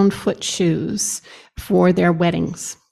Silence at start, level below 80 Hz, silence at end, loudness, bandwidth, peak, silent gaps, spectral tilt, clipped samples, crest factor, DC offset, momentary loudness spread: 0 s; -46 dBFS; 0.2 s; -19 LUFS; 14 kHz; -4 dBFS; none; -5 dB/octave; under 0.1%; 14 dB; under 0.1%; 14 LU